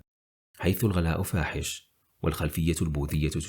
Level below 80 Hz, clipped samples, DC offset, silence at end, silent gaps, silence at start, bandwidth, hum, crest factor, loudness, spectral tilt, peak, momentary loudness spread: -42 dBFS; under 0.1%; under 0.1%; 0 s; none; 0.6 s; over 20 kHz; none; 16 dB; -29 LUFS; -5.5 dB/octave; -12 dBFS; 7 LU